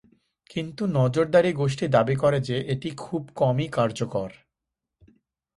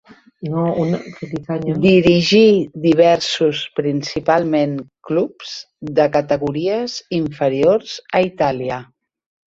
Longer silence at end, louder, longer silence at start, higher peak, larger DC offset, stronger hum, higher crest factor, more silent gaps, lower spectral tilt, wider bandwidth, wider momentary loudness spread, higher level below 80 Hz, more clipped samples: first, 1.25 s vs 0.7 s; second, -24 LUFS vs -17 LUFS; about the same, 0.5 s vs 0.4 s; second, -6 dBFS vs 0 dBFS; neither; neither; about the same, 20 dB vs 16 dB; neither; about the same, -7 dB/octave vs -6 dB/octave; first, 11.5 kHz vs 8 kHz; about the same, 12 LU vs 13 LU; second, -58 dBFS vs -50 dBFS; neither